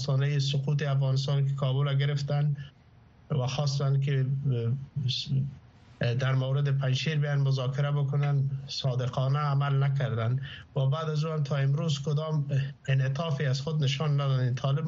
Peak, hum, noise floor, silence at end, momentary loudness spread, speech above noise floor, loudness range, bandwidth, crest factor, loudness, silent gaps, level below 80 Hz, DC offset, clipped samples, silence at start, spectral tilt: -14 dBFS; none; -56 dBFS; 0 s; 4 LU; 29 dB; 2 LU; 7.4 kHz; 12 dB; -28 LUFS; none; -62 dBFS; under 0.1%; under 0.1%; 0 s; -6 dB/octave